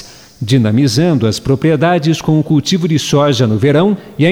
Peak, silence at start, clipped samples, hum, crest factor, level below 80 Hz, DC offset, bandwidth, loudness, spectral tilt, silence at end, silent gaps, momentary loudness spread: -2 dBFS; 0 s; under 0.1%; none; 10 dB; -44 dBFS; under 0.1%; 15.5 kHz; -12 LUFS; -6 dB/octave; 0 s; none; 3 LU